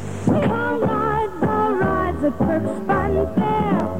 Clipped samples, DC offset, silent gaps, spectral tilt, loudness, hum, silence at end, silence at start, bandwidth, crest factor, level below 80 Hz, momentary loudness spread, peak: under 0.1%; 1%; none; -8 dB/octave; -20 LUFS; none; 0 s; 0 s; 16 kHz; 14 dB; -38 dBFS; 2 LU; -6 dBFS